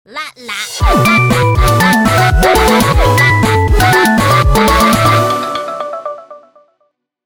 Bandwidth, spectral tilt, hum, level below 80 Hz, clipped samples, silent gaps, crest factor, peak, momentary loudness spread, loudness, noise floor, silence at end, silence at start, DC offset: over 20 kHz; -5 dB/octave; none; -20 dBFS; under 0.1%; none; 10 dB; 0 dBFS; 13 LU; -10 LUFS; -62 dBFS; 0.9 s; 0.1 s; under 0.1%